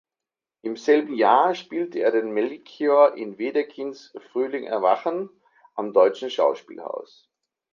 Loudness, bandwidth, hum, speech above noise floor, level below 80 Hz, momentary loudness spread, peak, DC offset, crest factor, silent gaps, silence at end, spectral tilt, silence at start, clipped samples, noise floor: -22 LUFS; 7.2 kHz; none; 67 dB; -78 dBFS; 16 LU; -4 dBFS; under 0.1%; 20 dB; none; 0.7 s; -5 dB/octave; 0.65 s; under 0.1%; -89 dBFS